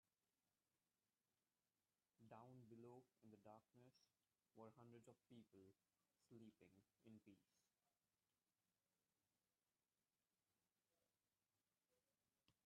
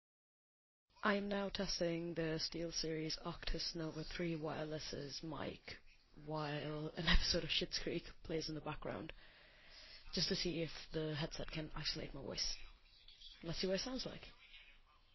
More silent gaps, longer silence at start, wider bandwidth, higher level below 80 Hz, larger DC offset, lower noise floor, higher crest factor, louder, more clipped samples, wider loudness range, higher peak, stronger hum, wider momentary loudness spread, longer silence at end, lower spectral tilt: neither; first, 2.2 s vs 0.95 s; second, 5.4 kHz vs 6.2 kHz; second, under -90 dBFS vs -54 dBFS; neither; first, under -90 dBFS vs -66 dBFS; about the same, 22 dB vs 24 dB; second, -68 LUFS vs -42 LUFS; neither; second, 1 LU vs 4 LU; second, -52 dBFS vs -20 dBFS; neither; second, 3 LU vs 19 LU; second, 0.15 s vs 0.35 s; first, -7 dB/octave vs -4 dB/octave